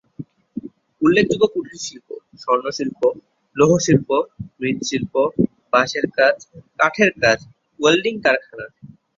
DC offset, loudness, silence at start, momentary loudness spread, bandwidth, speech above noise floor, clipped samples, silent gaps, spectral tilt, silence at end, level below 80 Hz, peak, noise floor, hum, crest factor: under 0.1%; -18 LUFS; 0.2 s; 19 LU; 7.8 kHz; 20 dB; under 0.1%; none; -4.5 dB/octave; 0.3 s; -54 dBFS; 0 dBFS; -38 dBFS; none; 20 dB